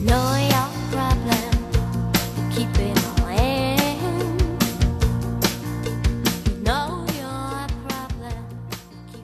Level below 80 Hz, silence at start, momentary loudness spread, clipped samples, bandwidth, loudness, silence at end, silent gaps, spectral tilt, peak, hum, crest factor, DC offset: -28 dBFS; 0 s; 10 LU; under 0.1%; 14 kHz; -23 LUFS; 0 s; none; -5 dB/octave; -4 dBFS; none; 18 dB; under 0.1%